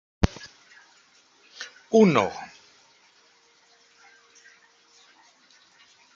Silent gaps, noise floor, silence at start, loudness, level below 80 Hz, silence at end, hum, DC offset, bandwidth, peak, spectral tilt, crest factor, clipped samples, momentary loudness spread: none; -60 dBFS; 0.2 s; -22 LUFS; -46 dBFS; 3.7 s; 60 Hz at -60 dBFS; under 0.1%; 7.4 kHz; -2 dBFS; -6.5 dB/octave; 28 dB; under 0.1%; 26 LU